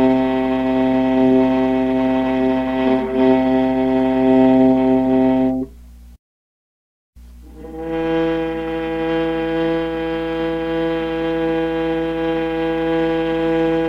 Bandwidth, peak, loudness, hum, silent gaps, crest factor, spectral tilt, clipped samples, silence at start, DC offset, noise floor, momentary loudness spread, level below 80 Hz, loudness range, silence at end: 5.6 kHz; -2 dBFS; -18 LUFS; none; 6.19-7.13 s; 14 dB; -8 dB/octave; under 0.1%; 0 s; under 0.1%; -40 dBFS; 8 LU; -40 dBFS; 8 LU; 0 s